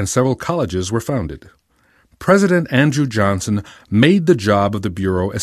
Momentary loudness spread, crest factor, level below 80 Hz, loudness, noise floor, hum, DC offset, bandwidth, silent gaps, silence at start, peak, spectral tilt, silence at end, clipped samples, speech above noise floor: 10 LU; 16 dB; -38 dBFS; -17 LUFS; -57 dBFS; none; under 0.1%; 14 kHz; none; 0 s; 0 dBFS; -6 dB/octave; 0 s; under 0.1%; 41 dB